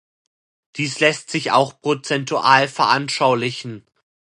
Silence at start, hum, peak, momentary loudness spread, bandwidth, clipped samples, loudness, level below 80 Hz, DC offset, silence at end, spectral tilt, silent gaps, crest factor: 0.75 s; none; 0 dBFS; 11 LU; 11.5 kHz; under 0.1%; -18 LUFS; -68 dBFS; under 0.1%; 0.6 s; -4 dB/octave; none; 20 dB